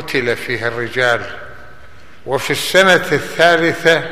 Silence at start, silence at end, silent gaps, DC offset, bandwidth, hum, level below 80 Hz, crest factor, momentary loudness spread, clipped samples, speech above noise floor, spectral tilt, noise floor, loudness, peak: 0 s; 0 s; none; 2%; 15 kHz; none; -50 dBFS; 16 dB; 11 LU; under 0.1%; 28 dB; -3.5 dB/octave; -42 dBFS; -14 LUFS; 0 dBFS